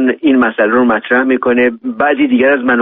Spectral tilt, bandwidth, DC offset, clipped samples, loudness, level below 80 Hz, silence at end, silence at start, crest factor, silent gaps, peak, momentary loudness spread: -3 dB/octave; 3.9 kHz; under 0.1%; under 0.1%; -11 LUFS; -50 dBFS; 0 s; 0 s; 10 dB; none; 0 dBFS; 3 LU